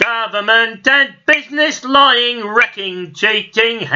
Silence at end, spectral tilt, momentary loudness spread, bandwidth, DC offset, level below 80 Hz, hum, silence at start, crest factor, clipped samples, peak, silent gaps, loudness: 0 s; -2.5 dB/octave; 6 LU; 7.6 kHz; under 0.1%; -60 dBFS; none; 0 s; 14 dB; under 0.1%; 0 dBFS; none; -12 LUFS